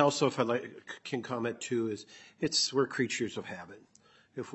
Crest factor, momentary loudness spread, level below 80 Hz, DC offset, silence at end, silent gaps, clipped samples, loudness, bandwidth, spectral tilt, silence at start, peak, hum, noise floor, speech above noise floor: 24 dB; 17 LU; -76 dBFS; under 0.1%; 0 s; none; under 0.1%; -32 LUFS; 8.4 kHz; -3.5 dB/octave; 0 s; -10 dBFS; none; -64 dBFS; 31 dB